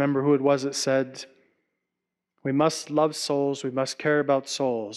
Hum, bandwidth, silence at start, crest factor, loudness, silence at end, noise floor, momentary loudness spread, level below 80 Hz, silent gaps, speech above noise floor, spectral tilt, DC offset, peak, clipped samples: none; 13 kHz; 0 s; 16 dB; -25 LUFS; 0 s; -85 dBFS; 8 LU; -76 dBFS; none; 60 dB; -4.5 dB/octave; under 0.1%; -10 dBFS; under 0.1%